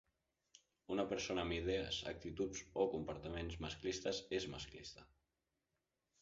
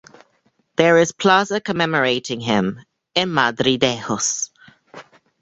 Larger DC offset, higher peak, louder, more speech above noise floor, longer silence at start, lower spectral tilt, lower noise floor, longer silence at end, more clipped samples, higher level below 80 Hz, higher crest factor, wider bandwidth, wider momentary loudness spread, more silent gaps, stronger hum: neither; second, -22 dBFS vs 0 dBFS; second, -43 LUFS vs -18 LUFS; about the same, 46 dB vs 46 dB; about the same, 0.9 s vs 0.8 s; about the same, -3.5 dB/octave vs -3.5 dB/octave; first, -89 dBFS vs -64 dBFS; first, 1.15 s vs 0.4 s; neither; about the same, -60 dBFS vs -58 dBFS; about the same, 22 dB vs 20 dB; about the same, 7.6 kHz vs 8.2 kHz; about the same, 9 LU vs 10 LU; neither; neither